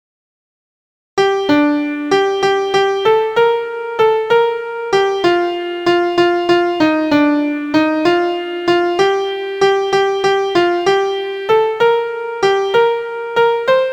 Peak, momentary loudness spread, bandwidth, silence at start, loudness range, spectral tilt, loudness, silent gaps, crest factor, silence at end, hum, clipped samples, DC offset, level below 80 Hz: 0 dBFS; 5 LU; 15.5 kHz; 1.15 s; 1 LU; -4.5 dB/octave; -15 LUFS; none; 14 dB; 0 s; none; under 0.1%; under 0.1%; -56 dBFS